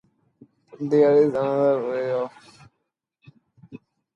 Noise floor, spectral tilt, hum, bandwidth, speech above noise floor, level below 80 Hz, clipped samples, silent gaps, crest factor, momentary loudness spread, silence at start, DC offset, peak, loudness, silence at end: -78 dBFS; -8.5 dB/octave; none; 7 kHz; 58 dB; -72 dBFS; under 0.1%; none; 18 dB; 13 LU; 0.8 s; under 0.1%; -6 dBFS; -21 LUFS; 0.4 s